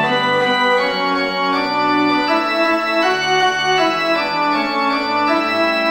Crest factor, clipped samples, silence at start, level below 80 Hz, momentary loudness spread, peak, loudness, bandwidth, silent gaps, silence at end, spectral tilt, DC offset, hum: 14 dB; under 0.1%; 0 s; -56 dBFS; 2 LU; -4 dBFS; -16 LUFS; 16.5 kHz; none; 0 s; -3.5 dB/octave; under 0.1%; none